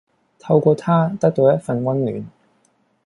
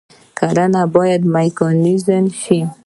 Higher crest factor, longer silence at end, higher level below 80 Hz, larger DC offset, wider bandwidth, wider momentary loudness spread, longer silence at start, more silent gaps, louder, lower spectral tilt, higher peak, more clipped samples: about the same, 16 dB vs 14 dB; first, 0.8 s vs 0.15 s; about the same, -60 dBFS vs -58 dBFS; neither; about the same, 11 kHz vs 11.5 kHz; first, 9 LU vs 4 LU; about the same, 0.45 s vs 0.35 s; neither; second, -18 LUFS vs -15 LUFS; first, -9 dB/octave vs -7 dB/octave; about the same, -2 dBFS vs 0 dBFS; neither